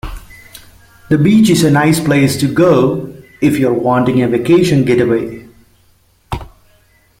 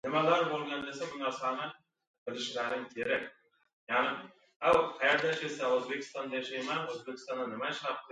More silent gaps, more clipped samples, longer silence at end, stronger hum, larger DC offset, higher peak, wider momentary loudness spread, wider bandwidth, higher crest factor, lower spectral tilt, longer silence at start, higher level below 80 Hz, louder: second, none vs 2.07-2.26 s, 3.73-3.87 s, 4.56-4.60 s; neither; first, 0.75 s vs 0 s; neither; neither; first, 0 dBFS vs -14 dBFS; first, 17 LU vs 12 LU; first, 16.5 kHz vs 9.4 kHz; second, 12 dB vs 20 dB; first, -6.5 dB/octave vs -4 dB/octave; about the same, 0.05 s vs 0.05 s; first, -38 dBFS vs -70 dBFS; first, -12 LUFS vs -33 LUFS